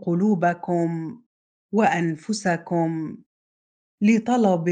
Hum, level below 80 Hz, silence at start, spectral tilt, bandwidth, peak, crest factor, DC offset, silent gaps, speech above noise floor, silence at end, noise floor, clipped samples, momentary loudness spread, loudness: none; -70 dBFS; 0 s; -6.5 dB/octave; 9.4 kHz; -6 dBFS; 16 dB; under 0.1%; 1.26-1.69 s, 3.26-3.98 s; over 68 dB; 0 s; under -90 dBFS; under 0.1%; 10 LU; -23 LUFS